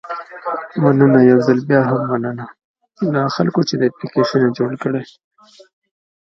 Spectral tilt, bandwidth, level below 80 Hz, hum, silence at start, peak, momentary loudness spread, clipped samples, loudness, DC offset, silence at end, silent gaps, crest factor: -7.5 dB/octave; 6.8 kHz; -62 dBFS; none; 0.05 s; 0 dBFS; 14 LU; under 0.1%; -16 LUFS; under 0.1%; 1.35 s; 2.64-2.74 s; 16 dB